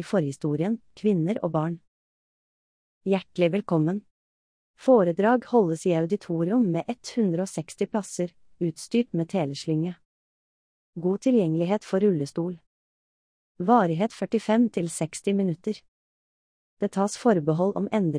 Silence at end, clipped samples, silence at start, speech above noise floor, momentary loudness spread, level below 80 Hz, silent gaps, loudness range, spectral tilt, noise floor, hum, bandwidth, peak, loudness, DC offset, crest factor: 0 s; under 0.1%; 0 s; over 66 dB; 11 LU; -70 dBFS; 1.88-3.01 s, 4.11-4.74 s, 10.05-10.93 s, 12.67-13.55 s, 15.88-16.77 s; 5 LU; -7 dB/octave; under -90 dBFS; none; 10.5 kHz; -8 dBFS; -25 LUFS; under 0.1%; 18 dB